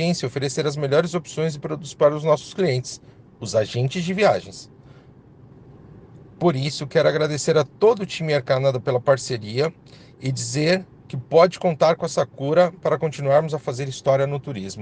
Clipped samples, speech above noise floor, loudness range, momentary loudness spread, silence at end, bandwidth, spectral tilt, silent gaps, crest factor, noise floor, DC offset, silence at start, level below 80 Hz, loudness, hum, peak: under 0.1%; 27 dB; 5 LU; 9 LU; 0 s; 9.8 kHz; -5.5 dB/octave; none; 18 dB; -48 dBFS; under 0.1%; 0 s; -60 dBFS; -21 LUFS; none; -2 dBFS